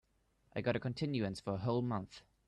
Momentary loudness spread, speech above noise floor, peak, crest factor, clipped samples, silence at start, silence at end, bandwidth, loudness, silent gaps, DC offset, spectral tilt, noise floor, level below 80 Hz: 7 LU; 36 dB; -22 dBFS; 16 dB; under 0.1%; 0.55 s; 0.3 s; 10.5 kHz; -38 LUFS; none; under 0.1%; -7 dB/octave; -73 dBFS; -66 dBFS